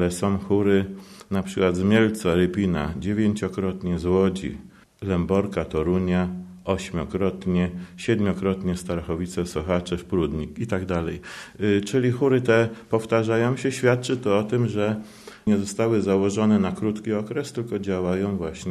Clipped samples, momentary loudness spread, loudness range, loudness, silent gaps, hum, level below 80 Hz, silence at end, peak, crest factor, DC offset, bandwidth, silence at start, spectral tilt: under 0.1%; 9 LU; 4 LU; -24 LUFS; none; none; -46 dBFS; 0 s; -6 dBFS; 18 dB; under 0.1%; 13 kHz; 0 s; -6.5 dB/octave